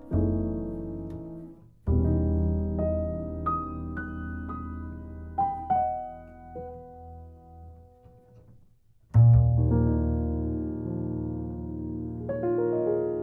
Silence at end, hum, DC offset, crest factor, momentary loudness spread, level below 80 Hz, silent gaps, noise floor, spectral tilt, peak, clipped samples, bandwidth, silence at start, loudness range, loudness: 0 s; none; under 0.1%; 18 dB; 18 LU; -36 dBFS; none; -58 dBFS; -13 dB/octave; -10 dBFS; under 0.1%; 2.4 kHz; 0 s; 8 LU; -28 LUFS